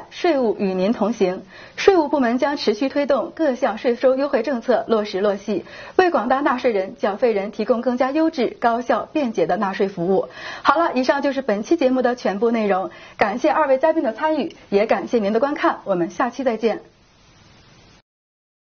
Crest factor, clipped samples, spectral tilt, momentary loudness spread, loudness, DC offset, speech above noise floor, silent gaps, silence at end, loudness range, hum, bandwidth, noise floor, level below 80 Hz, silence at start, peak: 20 dB; under 0.1%; -4 dB/octave; 5 LU; -20 LUFS; under 0.1%; 32 dB; none; 1.9 s; 2 LU; none; 6.8 kHz; -52 dBFS; -58 dBFS; 0 s; 0 dBFS